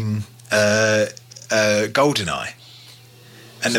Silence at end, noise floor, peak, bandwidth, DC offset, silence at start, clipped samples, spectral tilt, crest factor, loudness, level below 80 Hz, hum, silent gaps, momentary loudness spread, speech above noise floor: 0 s; -45 dBFS; -6 dBFS; 17 kHz; under 0.1%; 0 s; under 0.1%; -3.5 dB/octave; 16 dB; -19 LUFS; -58 dBFS; none; none; 13 LU; 27 dB